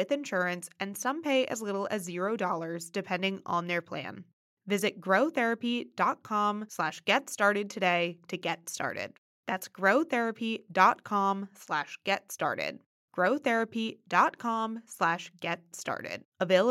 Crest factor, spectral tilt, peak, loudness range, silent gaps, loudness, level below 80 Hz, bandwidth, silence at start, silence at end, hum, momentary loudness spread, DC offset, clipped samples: 22 dB; -4 dB/octave; -8 dBFS; 3 LU; 4.33-4.57 s, 9.18-9.43 s, 12.86-13.08 s, 16.25-16.32 s; -30 LUFS; -88 dBFS; 16 kHz; 0 s; 0 s; none; 10 LU; under 0.1%; under 0.1%